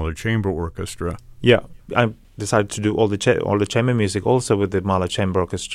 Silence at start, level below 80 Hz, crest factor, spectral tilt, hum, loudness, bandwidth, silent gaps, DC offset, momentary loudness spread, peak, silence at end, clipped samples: 0 s; -42 dBFS; 18 dB; -5.5 dB/octave; none; -21 LUFS; 14.5 kHz; none; under 0.1%; 9 LU; -2 dBFS; 0 s; under 0.1%